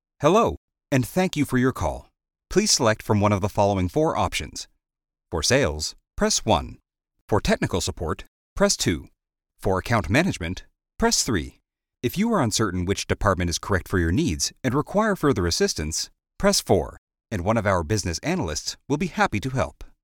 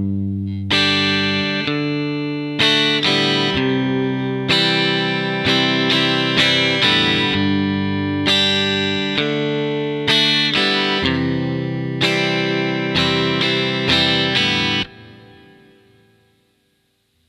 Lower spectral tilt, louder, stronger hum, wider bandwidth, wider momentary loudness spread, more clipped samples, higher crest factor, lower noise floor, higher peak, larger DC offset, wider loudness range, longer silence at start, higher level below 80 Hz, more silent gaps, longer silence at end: about the same, -4.5 dB/octave vs -4.5 dB/octave; second, -23 LUFS vs -16 LUFS; neither; first, 18.5 kHz vs 13.5 kHz; first, 11 LU vs 8 LU; neither; about the same, 20 dB vs 18 dB; about the same, -62 dBFS vs -64 dBFS; about the same, -4 dBFS vs -2 dBFS; neither; about the same, 3 LU vs 3 LU; first, 0.2 s vs 0 s; first, -40 dBFS vs -50 dBFS; first, 0.57-0.68 s, 7.21-7.28 s, 8.28-8.56 s, 16.98-17.07 s vs none; second, 0.15 s vs 2.05 s